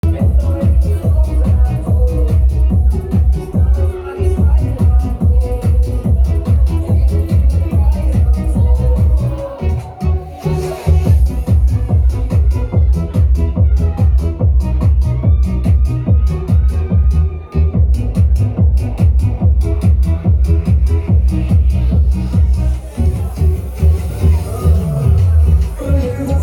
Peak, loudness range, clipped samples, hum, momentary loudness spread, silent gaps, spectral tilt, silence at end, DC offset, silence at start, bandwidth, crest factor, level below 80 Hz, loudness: 0 dBFS; 1 LU; under 0.1%; none; 4 LU; none; -9 dB/octave; 0 s; under 0.1%; 0.05 s; 11 kHz; 12 dB; -14 dBFS; -14 LUFS